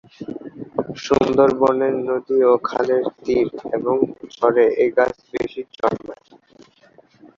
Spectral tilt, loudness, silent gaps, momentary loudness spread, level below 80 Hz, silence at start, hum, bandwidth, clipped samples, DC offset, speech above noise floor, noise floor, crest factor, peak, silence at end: -6.5 dB/octave; -19 LUFS; none; 12 LU; -54 dBFS; 0.2 s; none; 7.4 kHz; under 0.1%; under 0.1%; 34 dB; -52 dBFS; 18 dB; -2 dBFS; 1.25 s